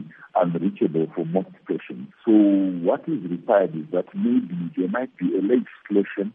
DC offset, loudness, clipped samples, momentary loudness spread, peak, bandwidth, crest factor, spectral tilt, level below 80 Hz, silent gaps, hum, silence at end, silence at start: under 0.1%; -23 LUFS; under 0.1%; 10 LU; -6 dBFS; 3.7 kHz; 18 dB; -11.5 dB/octave; -76 dBFS; none; none; 0.05 s; 0 s